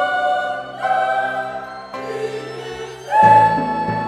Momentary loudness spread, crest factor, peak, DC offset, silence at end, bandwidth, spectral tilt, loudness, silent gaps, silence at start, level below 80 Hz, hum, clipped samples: 19 LU; 18 dB; 0 dBFS; under 0.1%; 0 s; 11.5 kHz; -5.5 dB/octave; -17 LUFS; none; 0 s; -54 dBFS; none; under 0.1%